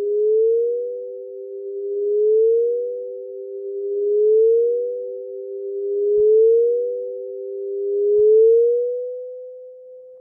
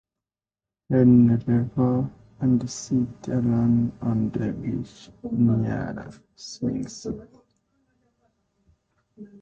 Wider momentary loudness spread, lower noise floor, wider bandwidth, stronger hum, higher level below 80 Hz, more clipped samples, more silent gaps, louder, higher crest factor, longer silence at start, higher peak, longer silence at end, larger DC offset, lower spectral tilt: about the same, 18 LU vs 18 LU; second, -41 dBFS vs under -90 dBFS; second, 0.6 kHz vs 7.8 kHz; neither; second, -70 dBFS vs -52 dBFS; neither; neither; first, -19 LUFS vs -24 LUFS; second, 10 dB vs 18 dB; second, 0 s vs 0.9 s; about the same, -8 dBFS vs -6 dBFS; second, 0 s vs 0.15 s; neither; first, -12 dB/octave vs -8 dB/octave